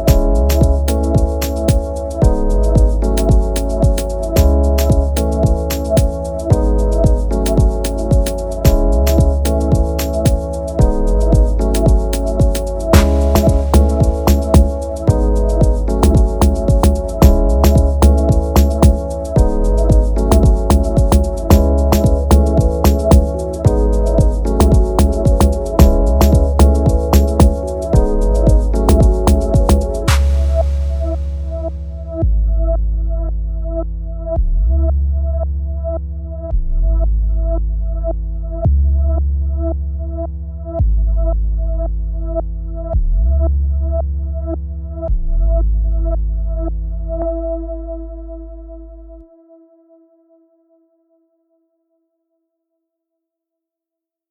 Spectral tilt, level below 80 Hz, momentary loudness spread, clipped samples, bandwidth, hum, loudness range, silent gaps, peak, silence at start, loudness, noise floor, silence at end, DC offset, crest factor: -7 dB/octave; -14 dBFS; 11 LU; under 0.1%; over 20 kHz; none; 7 LU; none; 0 dBFS; 0 s; -15 LUFS; -85 dBFS; 5.1 s; under 0.1%; 14 dB